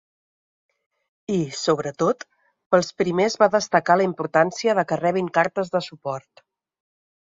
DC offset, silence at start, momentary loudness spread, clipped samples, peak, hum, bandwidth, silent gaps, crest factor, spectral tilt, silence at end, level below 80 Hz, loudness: under 0.1%; 1.3 s; 12 LU; under 0.1%; -2 dBFS; none; 7.8 kHz; 2.66-2.70 s; 20 dB; -5 dB/octave; 1.05 s; -66 dBFS; -22 LUFS